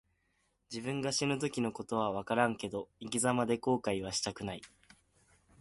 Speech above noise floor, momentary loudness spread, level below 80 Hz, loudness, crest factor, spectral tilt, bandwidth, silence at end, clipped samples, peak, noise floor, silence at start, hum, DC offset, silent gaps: 43 dB; 11 LU; -66 dBFS; -34 LUFS; 22 dB; -4 dB/octave; 11.5 kHz; 0.95 s; under 0.1%; -14 dBFS; -77 dBFS; 0.7 s; none; under 0.1%; none